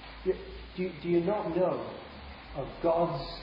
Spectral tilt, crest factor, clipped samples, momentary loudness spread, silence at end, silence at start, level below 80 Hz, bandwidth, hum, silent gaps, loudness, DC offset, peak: -9.5 dB/octave; 16 dB; under 0.1%; 15 LU; 0 s; 0 s; -50 dBFS; 5.4 kHz; none; none; -32 LUFS; under 0.1%; -16 dBFS